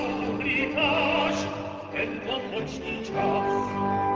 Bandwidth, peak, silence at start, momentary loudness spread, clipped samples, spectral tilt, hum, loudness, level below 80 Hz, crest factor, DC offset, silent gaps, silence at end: 8 kHz; -12 dBFS; 0 s; 9 LU; under 0.1%; -5 dB/octave; none; -27 LUFS; -52 dBFS; 16 dB; under 0.1%; none; 0 s